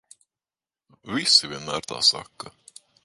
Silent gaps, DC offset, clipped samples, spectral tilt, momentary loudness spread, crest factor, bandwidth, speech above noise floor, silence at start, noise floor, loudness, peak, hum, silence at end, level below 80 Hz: none; under 0.1%; under 0.1%; -1 dB/octave; 23 LU; 24 dB; 12 kHz; over 66 dB; 1.05 s; under -90 dBFS; -21 LUFS; -4 dBFS; none; 0.55 s; -64 dBFS